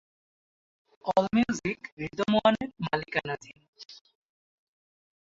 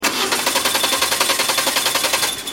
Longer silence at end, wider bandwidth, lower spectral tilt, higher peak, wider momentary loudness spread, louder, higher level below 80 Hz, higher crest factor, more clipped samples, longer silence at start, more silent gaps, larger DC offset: first, 1.35 s vs 0 s; second, 7.8 kHz vs 17 kHz; first, -5.5 dB/octave vs 0 dB/octave; second, -8 dBFS vs 0 dBFS; first, 24 LU vs 2 LU; second, -28 LUFS vs -16 LUFS; second, -62 dBFS vs -52 dBFS; about the same, 22 dB vs 18 dB; neither; first, 1.05 s vs 0 s; first, 1.92-1.97 s, 3.68-3.73 s vs none; second, under 0.1% vs 0.1%